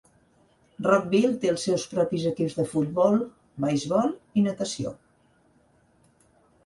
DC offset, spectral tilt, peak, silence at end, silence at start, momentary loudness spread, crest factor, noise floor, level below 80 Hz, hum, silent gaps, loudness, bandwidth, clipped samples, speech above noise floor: under 0.1%; -6 dB/octave; -8 dBFS; 1.7 s; 0.8 s; 8 LU; 18 dB; -63 dBFS; -64 dBFS; none; none; -25 LUFS; 11.5 kHz; under 0.1%; 39 dB